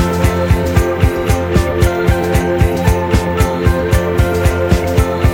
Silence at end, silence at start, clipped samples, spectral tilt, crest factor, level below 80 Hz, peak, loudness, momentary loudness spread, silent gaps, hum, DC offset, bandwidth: 0 s; 0 s; under 0.1%; -6.5 dB/octave; 12 dB; -18 dBFS; 0 dBFS; -14 LUFS; 2 LU; none; none; under 0.1%; 17.5 kHz